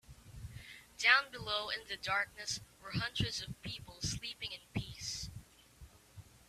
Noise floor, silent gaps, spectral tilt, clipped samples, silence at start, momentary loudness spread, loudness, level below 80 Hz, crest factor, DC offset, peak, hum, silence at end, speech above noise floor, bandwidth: -59 dBFS; none; -2.5 dB/octave; under 0.1%; 0.1 s; 22 LU; -36 LUFS; -58 dBFS; 28 dB; under 0.1%; -12 dBFS; none; 0.1 s; 22 dB; 15.5 kHz